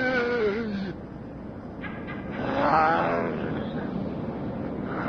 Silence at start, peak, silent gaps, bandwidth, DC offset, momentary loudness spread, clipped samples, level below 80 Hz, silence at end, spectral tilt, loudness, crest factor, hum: 0 s; -8 dBFS; none; 6.8 kHz; under 0.1%; 17 LU; under 0.1%; -50 dBFS; 0 s; -7.5 dB/octave; -28 LUFS; 20 dB; none